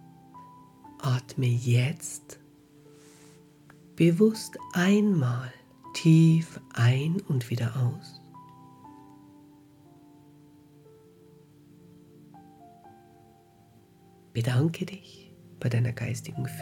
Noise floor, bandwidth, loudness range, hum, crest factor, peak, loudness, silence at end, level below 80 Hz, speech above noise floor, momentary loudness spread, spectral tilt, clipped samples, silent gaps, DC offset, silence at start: -58 dBFS; 15 kHz; 10 LU; none; 20 dB; -10 dBFS; -26 LUFS; 0 s; -68 dBFS; 32 dB; 21 LU; -6.5 dB/octave; under 0.1%; none; under 0.1%; 0.35 s